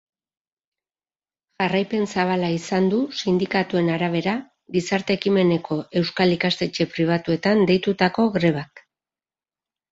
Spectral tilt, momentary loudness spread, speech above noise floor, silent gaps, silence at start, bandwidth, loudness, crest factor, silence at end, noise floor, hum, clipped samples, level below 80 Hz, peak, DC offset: -6 dB/octave; 6 LU; over 69 dB; none; 1.6 s; 8 kHz; -22 LUFS; 20 dB; 1.1 s; under -90 dBFS; none; under 0.1%; -60 dBFS; -4 dBFS; under 0.1%